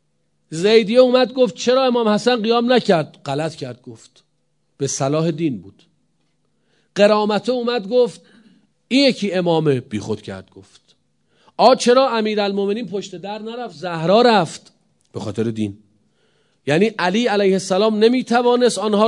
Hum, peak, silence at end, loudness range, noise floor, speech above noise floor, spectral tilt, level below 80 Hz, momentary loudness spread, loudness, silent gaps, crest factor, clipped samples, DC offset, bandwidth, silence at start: none; 0 dBFS; 0 s; 5 LU; -69 dBFS; 52 dB; -5 dB/octave; -68 dBFS; 16 LU; -17 LUFS; none; 18 dB; under 0.1%; under 0.1%; 11 kHz; 0.5 s